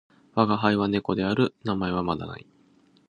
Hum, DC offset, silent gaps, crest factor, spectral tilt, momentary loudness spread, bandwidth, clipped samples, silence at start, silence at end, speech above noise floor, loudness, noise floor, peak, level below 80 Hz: none; under 0.1%; none; 22 dB; -8 dB/octave; 10 LU; 9.8 kHz; under 0.1%; 0.35 s; 0.7 s; 35 dB; -25 LUFS; -60 dBFS; -4 dBFS; -52 dBFS